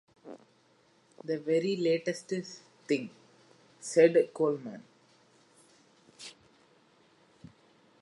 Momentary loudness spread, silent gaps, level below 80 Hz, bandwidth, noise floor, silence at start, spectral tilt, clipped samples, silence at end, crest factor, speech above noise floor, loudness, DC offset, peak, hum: 26 LU; none; -82 dBFS; 11.5 kHz; -66 dBFS; 0.25 s; -5 dB/octave; under 0.1%; 1.7 s; 24 dB; 37 dB; -29 LUFS; under 0.1%; -10 dBFS; none